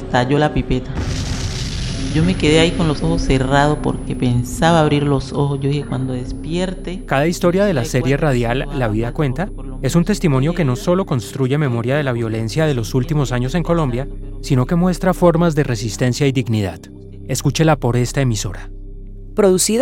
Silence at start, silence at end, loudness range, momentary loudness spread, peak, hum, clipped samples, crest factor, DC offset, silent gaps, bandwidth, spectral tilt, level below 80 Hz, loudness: 0 s; 0 s; 2 LU; 10 LU; 0 dBFS; none; under 0.1%; 16 dB; under 0.1%; none; 16.5 kHz; -6 dB/octave; -28 dBFS; -18 LUFS